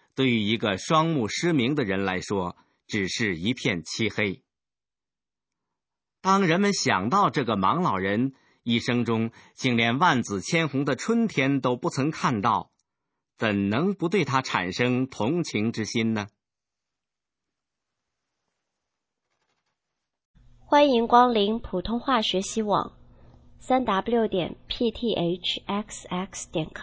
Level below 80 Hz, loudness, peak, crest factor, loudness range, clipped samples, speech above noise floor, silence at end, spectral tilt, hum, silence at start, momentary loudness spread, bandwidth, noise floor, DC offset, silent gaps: -54 dBFS; -25 LUFS; -4 dBFS; 22 dB; 6 LU; under 0.1%; over 66 dB; 0 s; -5 dB/octave; none; 0.15 s; 9 LU; 8 kHz; under -90 dBFS; under 0.1%; 20.25-20.34 s